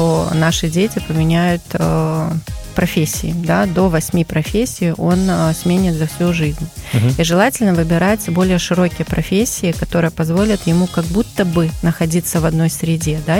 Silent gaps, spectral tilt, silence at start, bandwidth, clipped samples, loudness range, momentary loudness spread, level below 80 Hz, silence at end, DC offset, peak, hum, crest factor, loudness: none; -5.5 dB/octave; 0 s; 17 kHz; under 0.1%; 2 LU; 4 LU; -32 dBFS; 0 s; under 0.1%; -2 dBFS; none; 14 dB; -16 LUFS